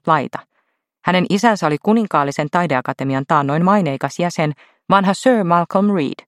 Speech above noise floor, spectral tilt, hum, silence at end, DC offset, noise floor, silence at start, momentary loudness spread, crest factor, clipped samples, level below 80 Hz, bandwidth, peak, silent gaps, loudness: 52 dB; -6 dB/octave; none; 0.15 s; under 0.1%; -68 dBFS; 0.05 s; 7 LU; 16 dB; under 0.1%; -62 dBFS; 13 kHz; 0 dBFS; none; -17 LUFS